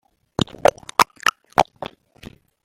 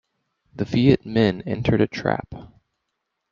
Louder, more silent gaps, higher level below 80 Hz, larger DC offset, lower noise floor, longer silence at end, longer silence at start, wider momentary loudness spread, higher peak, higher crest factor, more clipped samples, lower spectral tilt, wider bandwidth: about the same, -21 LUFS vs -21 LUFS; neither; about the same, -50 dBFS vs -48 dBFS; neither; second, -44 dBFS vs -78 dBFS; about the same, 0.75 s vs 0.85 s; about the same, 0.65 s vs 0.55 s; about the same, 14 LU vs 13 LU; about the same, 0 dBFS vs -2 dBFS; about the same, 22 dB vs 20 dB; neither; second, -3.5 dB/octave vs -8 dB/octave; first, 16.5 kHz vs 7.2 kHz